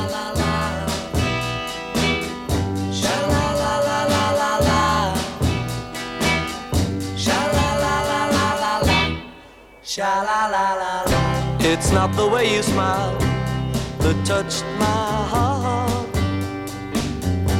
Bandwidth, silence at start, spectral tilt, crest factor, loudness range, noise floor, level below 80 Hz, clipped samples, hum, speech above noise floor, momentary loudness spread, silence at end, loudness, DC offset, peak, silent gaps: 17 kHz; 0 s; -4.5 dB/octave; 16 dB; 2 LU; -44 dBFS; -36 dBFS; under 0.1%; none; 25 dB; 7 LU; 0 s; -21 LUFS; under 0.1%; -4 dBFS; none